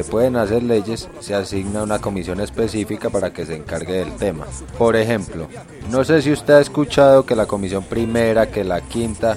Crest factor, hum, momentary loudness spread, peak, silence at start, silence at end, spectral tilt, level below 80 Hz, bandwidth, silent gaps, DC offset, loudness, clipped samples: 18 dB; none; 13 LU; 0 dBFS; 0 s; 0 s; -6 dB/octave; -40 dBFS; 14 kHz; none; under 0.1%; -18 LUFS; under 0.1%